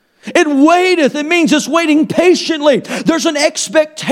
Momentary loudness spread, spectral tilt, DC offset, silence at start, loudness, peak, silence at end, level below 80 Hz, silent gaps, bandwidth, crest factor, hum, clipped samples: 5 LU; -3.5 dB/octave; under 0.1%; 0.25 s; -12 LUFS; 0 dBFS; 0 s; -56 dBFS; none; 15 kHz; 12 dB; none; under 0.1%